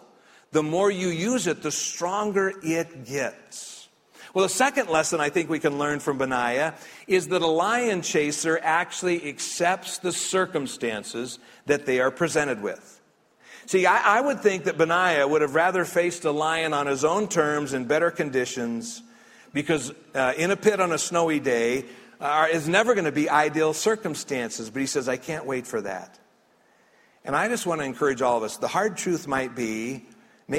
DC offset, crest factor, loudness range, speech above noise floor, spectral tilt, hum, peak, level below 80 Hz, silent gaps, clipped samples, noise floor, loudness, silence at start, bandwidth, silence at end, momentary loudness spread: under 0.1%; 20 dB; 5 LU; 37 dB; -3.5 dB/octave; none; -4 dBFS; -66 dBFS; none; under 0.1%; -61 dBFS; -24 LUFS; 0.5 s; 16 kHz; 0 s; 10 LU